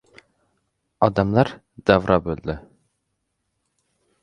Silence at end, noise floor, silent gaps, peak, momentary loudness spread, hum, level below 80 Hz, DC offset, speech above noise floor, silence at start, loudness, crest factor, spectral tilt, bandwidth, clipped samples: 1.65 s; -75 dBFS; none; 0 dBFS; 12 LU; none; -44 dBFS; under 0.1%; 56 dB; 1 s; -21 LUFS; 24 dB; -8 dB/octave; 10 kHz; under 0.1%